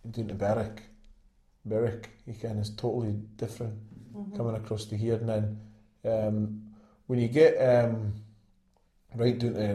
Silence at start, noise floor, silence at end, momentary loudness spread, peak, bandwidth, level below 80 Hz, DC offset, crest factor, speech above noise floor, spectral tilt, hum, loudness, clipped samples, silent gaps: 0.05 s; -67 dBFS; 0 s; 20 LU; -10 dBFS; 12.5 kHz; -58 dBFS; under 0.1%; 20 dB; 38 dB; -8 dB/octave; none; -29 LUFS; under 0.1%; none